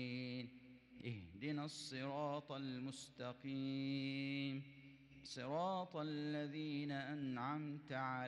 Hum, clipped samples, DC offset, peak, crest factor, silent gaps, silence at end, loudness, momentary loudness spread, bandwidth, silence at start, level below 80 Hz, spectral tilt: none; under 0.1%; under 0.1%; -32 dBFS; 14 dB; none; 0 s; -46 LUFS; 10 LU; 11.5 kHz; 0 s; -82 dBFS; -6 dB/octave